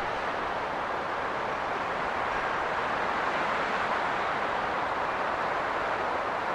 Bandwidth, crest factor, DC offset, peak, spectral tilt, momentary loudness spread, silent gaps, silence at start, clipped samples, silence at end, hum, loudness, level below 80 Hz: 13 kHz; 14 dB; under 0.1%; -16 dBFS; -4 dB/octave; 3 LU; none; 0 s; under 0.1%; 0 s; none; -29 LUFS; -56 dBFS